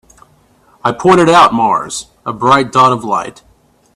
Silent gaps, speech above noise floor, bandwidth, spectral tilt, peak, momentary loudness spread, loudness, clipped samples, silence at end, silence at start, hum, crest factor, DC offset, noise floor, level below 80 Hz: none; 39 dB; 13 kHz; -5 dB/octave; 0 dBFS; 15 LU; -11 LUFS; under 0.1%; 0.65 s; 0.85 s; none; 12 dB; under 0.1%; -50 dBFS; -50 dBFS